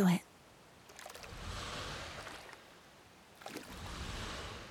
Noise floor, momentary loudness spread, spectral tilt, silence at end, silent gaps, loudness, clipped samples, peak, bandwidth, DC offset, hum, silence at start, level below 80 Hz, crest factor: -60 dBFS; 16 LU; -5 dB/octave; 0 s; none; -43 LUFS; under 0.1%; -20 dBFS; 16.5 kHz; under 0.1%; none; 0 s; -56 dBFS; 22 dB